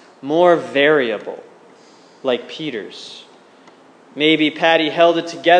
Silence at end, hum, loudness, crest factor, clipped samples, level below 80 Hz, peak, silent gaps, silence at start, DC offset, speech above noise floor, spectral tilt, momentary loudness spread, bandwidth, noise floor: 0 s; none; -16 LUFS; 18 dB; under 0.1%; -80 dBFS; 0 dBFS; none; 0.25 s; under 0.1%; 31 dB; -5 dB/octave; 20 LU; 9.6 kHz; -47 dBFS